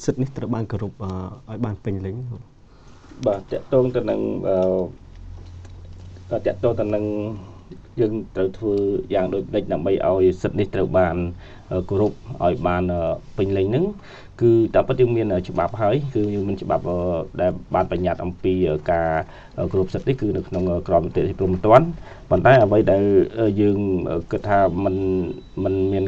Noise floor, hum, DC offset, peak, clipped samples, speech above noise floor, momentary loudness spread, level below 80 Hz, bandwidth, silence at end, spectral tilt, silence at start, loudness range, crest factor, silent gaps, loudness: -46 dBFS; none; under 0.1%; 0 dBFS; under 0.1%; 25 dB; 13 LU; -42 dBFS; 7.6 kHz; 0 s; -8.5 dB/octave; 0 s; 8 LU; 20 dB; none; -21 LUFS